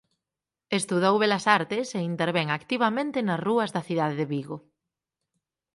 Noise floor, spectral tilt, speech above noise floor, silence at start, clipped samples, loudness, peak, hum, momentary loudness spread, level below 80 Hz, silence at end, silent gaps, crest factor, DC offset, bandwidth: -89 dBFS; -5 dB/octave; 64 dB; 0.7 s; under 0.1%; -26 LUFS; -4 dBFS; none; 8 LU; -72 dBFS; 1.15 s; none; 22 dB; under 0.1%; 11.5 kHz